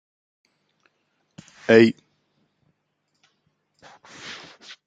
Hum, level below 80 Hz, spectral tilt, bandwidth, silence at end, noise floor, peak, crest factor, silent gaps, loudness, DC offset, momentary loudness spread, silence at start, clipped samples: 50 Hz at -70 dBFS; -70 dBFS; -6 dB/octave; 8 kHz; 0.55 s; -74 dBFS; -2 dBFS; 24 dB; none; -17 LUFS; under 0.1%; 25 LU; 1.7 s; under 0.1%